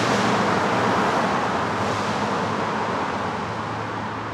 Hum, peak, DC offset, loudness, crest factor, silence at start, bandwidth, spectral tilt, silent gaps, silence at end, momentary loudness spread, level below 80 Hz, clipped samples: none; -8 dBFS; under 0.1%; -23 LUFS; 14 dB; 0 s; 14.5 kHz; -5 dB/octave; none; 0 s; 8 LU; -54 dBFS; under 0.1%